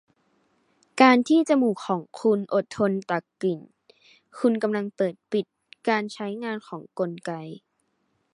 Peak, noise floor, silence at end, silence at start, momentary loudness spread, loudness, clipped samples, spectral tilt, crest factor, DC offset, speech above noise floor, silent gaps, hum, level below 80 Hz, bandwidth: -2 dBFS; -73 dBFS; 0.8 s; 0.95 s; 16 LU; -24 LUFS; under 0.1%; -6 dB/octave; 24 dB; under 0.1%; 48 dB; none; none; -74 dBFS; 11 kHz